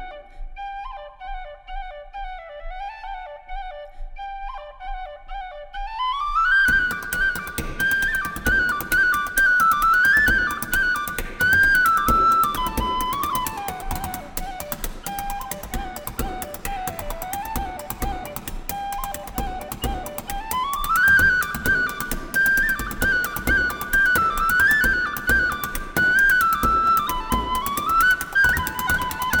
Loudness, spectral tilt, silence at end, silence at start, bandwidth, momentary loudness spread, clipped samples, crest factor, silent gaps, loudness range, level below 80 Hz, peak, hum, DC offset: -20 LUFS; -2.5 dB/octave; 0 s; 0 s; over 20 kHz; 19 LU; under 0.1%; 18 dB; none; 17 LU; -34 dBFS; -4 dBFS; none; under 0.1%